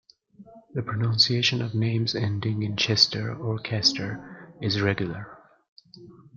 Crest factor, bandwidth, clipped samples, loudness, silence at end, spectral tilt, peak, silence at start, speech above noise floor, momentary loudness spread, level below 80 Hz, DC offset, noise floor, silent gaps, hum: 22 dB; 7.6 kHz; under 0.1%; -24 LUFS; 0.2 s; -4.5 dB/octave; -4 dBFS; 0.4 s; 26 dB; 15 LU; -62 dBFS; under 0.1%; -52 dBFS; 5.68-5.76 s; none